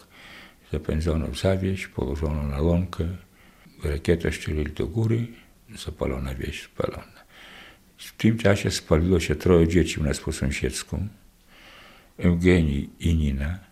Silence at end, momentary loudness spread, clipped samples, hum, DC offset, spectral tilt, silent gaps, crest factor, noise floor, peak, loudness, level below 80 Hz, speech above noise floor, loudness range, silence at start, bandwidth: 0.1 s; 20 LU; under 0.1%; none; under 0.1%; -6.5 dB/octave; none; 22 dB; -53 dBFS; -4 dBFS; -25 LUFS; -36 dBFS; 29 dB; 7 LU; 0.2 s; 15 kHz